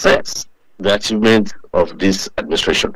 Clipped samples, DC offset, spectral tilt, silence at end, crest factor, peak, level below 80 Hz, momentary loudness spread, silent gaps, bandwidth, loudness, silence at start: under 0.1%; under 0.1%; -4 dB/octave; 0 s; 16 dB; 0 dBFS; -40 dBFS; 10 LU; none; 15.5 kHz; -16 LUFS; 0 s